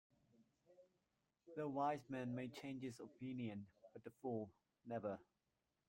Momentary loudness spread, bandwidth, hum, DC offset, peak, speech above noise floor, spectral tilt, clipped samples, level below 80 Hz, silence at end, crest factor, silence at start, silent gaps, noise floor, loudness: 14 LU; 16 kHz; none; under 0.1%; -30 dBFS; 42 dB; -7 dB/octave; under 0.1%; -86 dBFS; 0.65 s; 20 dB; 0.4 s; none; -89 dBFS; -49 LUFS